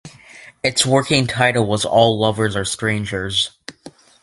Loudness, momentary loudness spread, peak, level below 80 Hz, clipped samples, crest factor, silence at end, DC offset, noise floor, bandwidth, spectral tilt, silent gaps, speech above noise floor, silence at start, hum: -17 LUFS; 8 LU; 0 dBFS; -46 dBFS; under 0.1%; 18 dB; 0.35 s; under 0.1%; -43 dBFS; 11.5 kHz; -4 dB/octave; none; 26 dB; 0.05 s; none